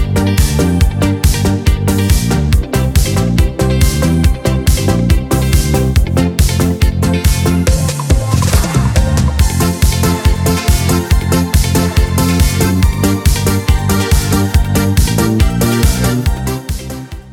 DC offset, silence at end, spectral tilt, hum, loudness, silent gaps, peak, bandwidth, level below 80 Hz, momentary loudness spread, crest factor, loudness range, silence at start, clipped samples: 0.5%; 0 s; -5.5 dB/octave; none; -13 LUFS; none; 0 dBFS; 18 kHz; -16 dBFS; 2 LU; 12 dB; 0 LU; 0 s; under 0.1%